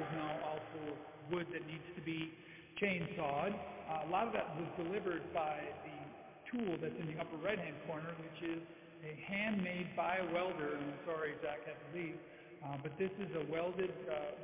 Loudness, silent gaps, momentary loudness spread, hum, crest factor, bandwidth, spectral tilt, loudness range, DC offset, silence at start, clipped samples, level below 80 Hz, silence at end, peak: -42 LUFS; none; 11 LU; none; 24 dB; 3.9 kHz; -4.5 dB/octave; 3 LU; under 0.1%; 0 s; under 0.1%; -72 dBFS; 0 s; -18 dBFS